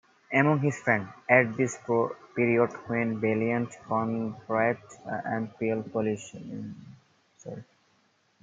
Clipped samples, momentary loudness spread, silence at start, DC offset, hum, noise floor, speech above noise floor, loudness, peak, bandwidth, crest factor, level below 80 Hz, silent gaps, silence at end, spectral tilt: under 0.1%; 17 LU; 0.3 s; under 0.1%; none; -68 dBFS; 40 dB; -28 LUFS; -6 dBFS; 9.2 kHz; 24 dB; -72 dBFS; none; 0.8 s; -7 dB/octave